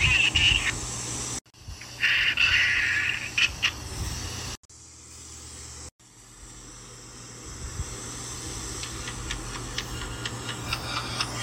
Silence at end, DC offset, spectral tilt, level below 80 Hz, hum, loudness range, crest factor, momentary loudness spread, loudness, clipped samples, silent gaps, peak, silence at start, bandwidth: 0 s; under 0.1%; -1.5 dB/octave; -42 dBFS; none; 17 LU; 20 dB; 23 LU; -26 LUFS; under 0.1%; 1.41-1.45 s, 4.57-4.69 s, 5.92-5.99 s; -8 dBFS; 0 s; 17 kHz